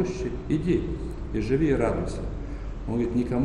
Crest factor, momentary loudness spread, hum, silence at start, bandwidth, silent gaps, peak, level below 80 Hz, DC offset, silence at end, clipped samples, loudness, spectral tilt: 16 dB; 12 LU; none; 0 s; 11 kHz; none; -10 dBFS; -36 dBFS; under 0.1%; 0 s; under 0.1%; -28 LUFS; -8 dB/octave